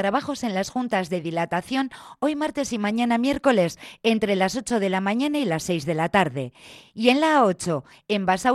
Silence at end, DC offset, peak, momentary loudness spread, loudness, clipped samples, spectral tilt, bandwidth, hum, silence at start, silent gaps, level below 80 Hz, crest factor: 0 s; under 0.1%; -4 dBFS; 7 LU; -23 LUFS; under 0.1%; -5 dB/octave; 13.5 kHz; none; 0 s; none; -58 dBFS; 20 dB